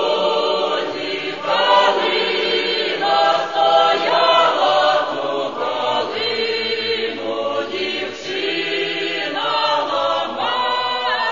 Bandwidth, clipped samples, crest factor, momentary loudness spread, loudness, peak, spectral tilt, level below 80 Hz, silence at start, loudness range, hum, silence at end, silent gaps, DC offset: 7.4 kHz; under 0.1%; 18 dB; 8 LU; -18 LUFS; -2 dBFS; -3 dB/octave; -70 dBFS; 0 s; 5 LU; none; 0 s; none; 0.4%